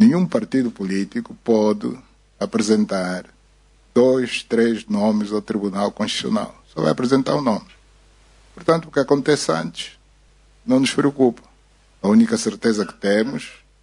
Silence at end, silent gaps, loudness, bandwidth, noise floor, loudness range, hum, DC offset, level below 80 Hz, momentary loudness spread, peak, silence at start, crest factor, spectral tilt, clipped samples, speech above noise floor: 0.3 s; none; -20 LUFS; 11 kHz; -54 dBFS; 3 LU; none; under 0.1%; -54 dBFS; 12 LU; -2 dBFS; 0 s; 18 dB; -5.5 dB/octave; under 0.1%; 35 dB